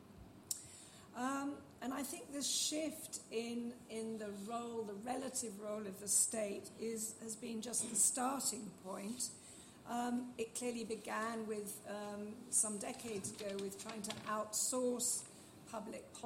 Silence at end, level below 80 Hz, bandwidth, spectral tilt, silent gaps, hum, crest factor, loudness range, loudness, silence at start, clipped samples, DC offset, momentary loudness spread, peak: 0 s; -78 dBFS; 16 kHz; -2 dB/octave; none; none; 24 dB; 6 LU; -40 LUFS; 0 s; under 0.1%; under 0.1%; 13 LU; -20 dBFS